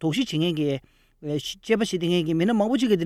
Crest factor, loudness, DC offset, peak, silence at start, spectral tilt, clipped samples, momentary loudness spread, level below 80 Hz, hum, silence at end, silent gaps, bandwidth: 16 dB; -24 LUFS; under 0.1%; -8 dBFS; 0 s; -6 dB/octave; under 0.1%; 9 LU; -56 dBFS; none; 0 s; none; 14.5 kHz